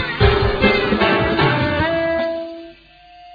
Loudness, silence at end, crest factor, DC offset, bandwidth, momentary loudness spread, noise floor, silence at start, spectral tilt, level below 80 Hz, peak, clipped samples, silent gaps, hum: -17 LUFS; 0 s; 18 dB; under 0.1%; 5 kHz; 10 LU; -45 dBFS; 0 s; -8 dB/octave; -30 dBFS; 0 dBFS; under 0.1%; none; none